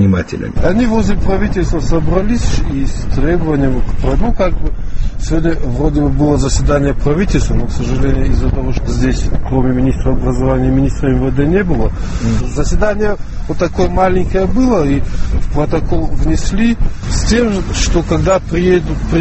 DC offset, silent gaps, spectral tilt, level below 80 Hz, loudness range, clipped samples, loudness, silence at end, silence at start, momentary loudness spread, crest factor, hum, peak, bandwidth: under 0.1%; none; -6.5 dB/octave; -16 dBFS; 1 LU; under 0.1%; -15 LUFS; 0 s; 0 s; 6 LU; 12 dB; none; 0 dBFS; 8.4 kHz